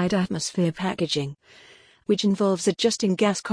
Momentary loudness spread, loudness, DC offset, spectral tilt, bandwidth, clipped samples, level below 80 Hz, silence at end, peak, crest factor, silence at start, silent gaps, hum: 5 LU; -24 LUFS; under 0.1%; -5 dB/octave; 10.5 kHz; under 0.1%; -60 dBFS; 0 s; -8 dBFS; 16 dB; 0 s; none; none